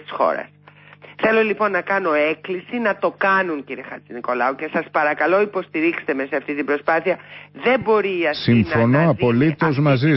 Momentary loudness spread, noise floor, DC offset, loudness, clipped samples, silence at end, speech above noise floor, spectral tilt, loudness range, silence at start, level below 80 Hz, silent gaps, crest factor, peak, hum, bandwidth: 10 LU; -46 dBFS; under 0.1%; -19 LUFS; under 0.1%; 0 s; 27 dB; -11.5 dB/octave; 3 LU; 0.1 s; -52 dBFS; none; 14 dB; -6 dBFS; none; 5.8 kHz